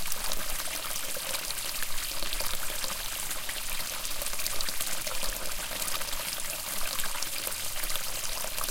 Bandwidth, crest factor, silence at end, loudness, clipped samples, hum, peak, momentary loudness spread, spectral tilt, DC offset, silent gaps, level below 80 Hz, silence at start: 17 kHz; 22 dB; 0 s; -32 LUFS; under 0.1%; none; -8 dBFS; 2 LU; 0 dB/octave; under 0.1%; none; -42 dBFS; 0 s